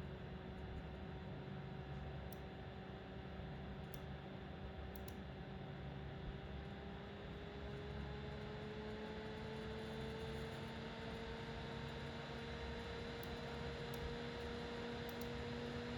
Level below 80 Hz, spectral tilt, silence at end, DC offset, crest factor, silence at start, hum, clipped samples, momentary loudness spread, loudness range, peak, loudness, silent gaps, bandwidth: -56 dBFS; -6.5 dB/octave; 0 s; under 0.1%; 16 dB; 0 s; none; under 0.1%; 5 LU; 4 LU; -34 dBFS; -49 LUFS; none; 18 kHz